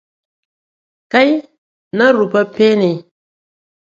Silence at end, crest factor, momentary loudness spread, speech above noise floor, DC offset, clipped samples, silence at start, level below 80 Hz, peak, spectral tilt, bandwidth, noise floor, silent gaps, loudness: 0.85 s; 16 dB; 9 LU; over 78 dB; under 0.1%; under 0.1%; 1.15 s; -64 dBFS; 0 dBFS; -6.5 dB/octave; 7.6 kHz; under -90 dBFS; 1.58-1.91 s; -14 LUFS